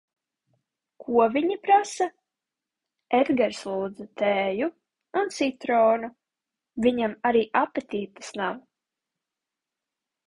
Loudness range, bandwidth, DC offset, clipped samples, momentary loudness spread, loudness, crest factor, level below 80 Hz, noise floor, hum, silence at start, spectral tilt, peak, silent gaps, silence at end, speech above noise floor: 3 LU; 11.5 kHz; under 0.1%; under 0.1%; 12 LU; -25 LUFS; 18 dB; -68 dBFS; -88 dBFS; none; 1 s; -4.5 dB/octave; -8 dBFS; none; 1.7 s; 64 dB